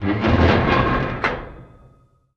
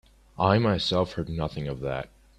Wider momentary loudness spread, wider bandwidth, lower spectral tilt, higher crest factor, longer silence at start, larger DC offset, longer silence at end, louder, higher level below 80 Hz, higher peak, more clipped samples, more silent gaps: first, 13 LU vs 10 LU; second, 7 kHz vs 11 kHz; about the same, -7.5 dB/octave vs -6.5 dB/octave; about the same, 18 dB vs 22 dB; second, 0 s vs 0.4 s; neither; first, 0.75 s vs 0.35 s; first, -18 LUFS vs -27 LUFS; first, -34 dBFS vs -48 dBFS; first, -2 dBFS vs -6 dBFS; neither; neither